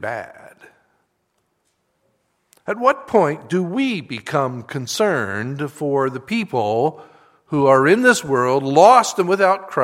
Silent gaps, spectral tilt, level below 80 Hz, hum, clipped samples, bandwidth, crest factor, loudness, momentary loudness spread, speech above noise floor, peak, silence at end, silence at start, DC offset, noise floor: none; -5 dB/octave; -64 dBFS; none; under 0.1%; 16.5 kHz; 18 dB; -18 LUFS; 14 LU; 52 dB; 0 dBFS; 0 s; 0 s; under 0.1%; -69 dBFS